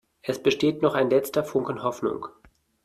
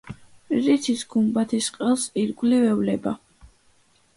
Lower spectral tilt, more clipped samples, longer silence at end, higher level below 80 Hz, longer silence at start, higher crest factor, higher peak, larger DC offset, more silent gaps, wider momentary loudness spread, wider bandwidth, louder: about the same, -5.5 dB/octave vs -5 dB/octave; neither; second, 0.55 s vs 0.7 s; about the same, -62 dBFS vs -60 dBFS; first, 0.25 s vs 0.05 s; about the same, 18 dB vs 16 dB; about the same, -8 dBFS vs -8 dBFS; neither; neither; about the same, 9 LU vs 10 LU; first, 15 kHz vs 11.5 kHz; about the same, -25 LUFS vs -23 LUFS